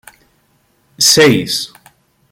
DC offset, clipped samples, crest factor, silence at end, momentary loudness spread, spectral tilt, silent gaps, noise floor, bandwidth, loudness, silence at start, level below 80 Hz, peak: under 0.1%; under 0.1%; 16 dB; 0.65 s; 13 LU; -2.5 dB/octave; none; -57 dBFS; 17 kHz; -10 LUFS; 1 s; -54 dBFS; 0 dBFS